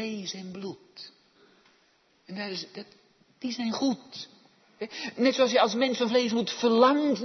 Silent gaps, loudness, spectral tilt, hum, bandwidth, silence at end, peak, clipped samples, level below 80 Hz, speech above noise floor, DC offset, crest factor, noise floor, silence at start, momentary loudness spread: none; -27 LUFS; -4 dB/octave; none; 6.4 kHz; 0 s; -8 dBFS; under 0.1%; -80 dBFS; 39 dB; under 0.1%; 20 dB; -66 dBFS; 0 s; 21 LU